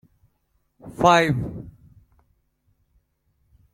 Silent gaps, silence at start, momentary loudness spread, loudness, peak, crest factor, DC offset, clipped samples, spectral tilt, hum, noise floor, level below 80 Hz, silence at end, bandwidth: none; 0.85 s; 26 LU; -20 LUFS; -4 dBFS; 24 dB; under 0.1%; under 0.1%; -5.5 dB/octave; none; -70 dBFS; -52 dBFS; 2.05 s; 15.5 kHz